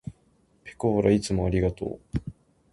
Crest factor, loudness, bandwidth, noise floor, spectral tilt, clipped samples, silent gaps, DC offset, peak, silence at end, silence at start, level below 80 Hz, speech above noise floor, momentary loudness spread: 20 dB; -26 LUFS; 11.5 kHz; -64 dBFS; -7 dB/octave; under 0.1%; none; under 0.1%; -8 dBFS; 0.4 s; 0.05 s; -42 dBFS; 39 dB; 21 LU